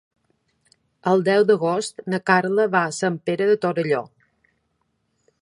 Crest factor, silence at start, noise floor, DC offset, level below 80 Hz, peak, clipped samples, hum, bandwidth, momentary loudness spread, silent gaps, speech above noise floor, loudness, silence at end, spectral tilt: 22 dB; 1.05 s; -71 dBFS; under 0.1%; -70 dBFS; -2 dBFS; under 0.1%; none; 11.5 kHz; 8 LU; none; 51 dB; -21 LUFS; 1.35 s; -5.5 dB/octave